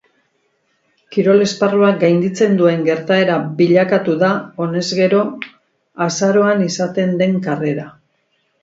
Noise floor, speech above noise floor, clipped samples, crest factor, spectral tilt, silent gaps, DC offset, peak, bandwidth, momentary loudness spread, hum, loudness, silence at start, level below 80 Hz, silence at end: -64 dBFS; 49 dB; under 0.1%; 16 dB; -6 dB/octave; none; under 0.1%; 0 dBFS; 7.8 kHz; 9 LU; none; -15 LUFS; 1.1 s; -64 dBFS; 0.75 s